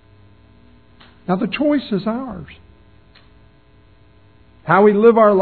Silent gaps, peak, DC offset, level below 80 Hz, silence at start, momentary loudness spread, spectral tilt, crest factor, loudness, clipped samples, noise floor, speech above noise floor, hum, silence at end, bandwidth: none; 0 dBFS; 0.2%; -52 dBFS; 1.3 s; 22 LU; -11 dB/octave; 18 dB; -16 LUFS; under 0.1%; -51 dBFS; 36 dB; none; 0 s; 4.5 kHz